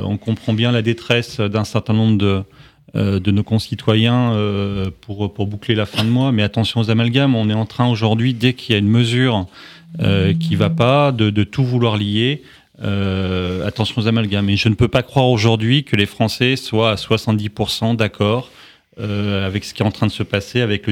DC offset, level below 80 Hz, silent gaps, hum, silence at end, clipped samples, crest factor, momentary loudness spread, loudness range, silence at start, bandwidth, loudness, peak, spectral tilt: under 0.1%; -46 dBFS; none; none; 0 s; under 0.1%; 16 dB; 8 LU; 3 LU; 0 s; 13 kHz; -17 LUFS; 0 dBFS; -6.5 dB/octave